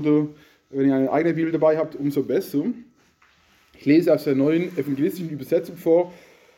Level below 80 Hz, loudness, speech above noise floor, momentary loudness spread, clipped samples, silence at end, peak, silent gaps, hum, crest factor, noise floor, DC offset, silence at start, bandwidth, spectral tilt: -68 dBFS; -22 LUFS; 38 dB; 10 LU; under 0.1%; 0.45 s; -6 dBFS; none; none; 16 dB; -59 dBFS; under 0.1%; 0 s; 17 kHz; -8 dB/octave